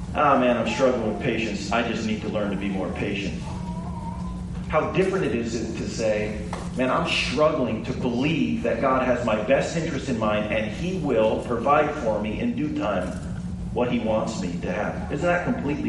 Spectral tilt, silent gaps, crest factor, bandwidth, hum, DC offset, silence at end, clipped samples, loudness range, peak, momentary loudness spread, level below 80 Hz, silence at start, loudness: -6 dB/octave; none; 18 dB; 11.5 kHz; none; under 0.1%; 0 s; under 0.1%; 4 LU; -6 dBFS; 10 LU; -42 dBFS; 0 s; -24 LUFS